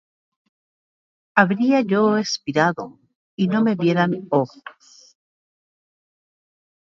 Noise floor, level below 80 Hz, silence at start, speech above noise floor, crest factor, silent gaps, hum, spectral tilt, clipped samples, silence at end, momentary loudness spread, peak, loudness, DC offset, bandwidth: under -90 dBFS; -68 dBFS; 1.35 s; over 71 dB; 22 dB; 3.15-3.38 s; none; -6 dB/octave; under 0.1%; 2.15 s; 7 LU; 0 dBFS; -20 LUFS; under 0.1%; 7.6 kHz